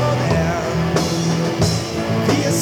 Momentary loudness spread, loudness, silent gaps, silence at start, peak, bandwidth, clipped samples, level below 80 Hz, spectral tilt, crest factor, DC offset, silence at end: 3 LU; -19 LUFS; none; 0 s; -4 dBFS; 18 kHz; under 0.1%; -38 dBFS; -5.5 dB/octave; 14 dB; under 0.1%; 0 s